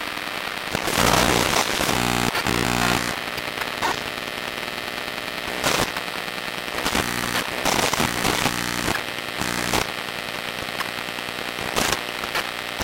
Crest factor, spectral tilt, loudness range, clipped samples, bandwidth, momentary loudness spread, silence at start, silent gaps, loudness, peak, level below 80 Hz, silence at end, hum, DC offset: 24 dB; -2.5 dB/octave; 5 LU; under 0.1%; 17 kHz; 8 LU; 0 s; none; -23 LUFS; 0 dBFS; -42 dBFS; 0 s; 60 Hz at -40 dBFS; under 0.1%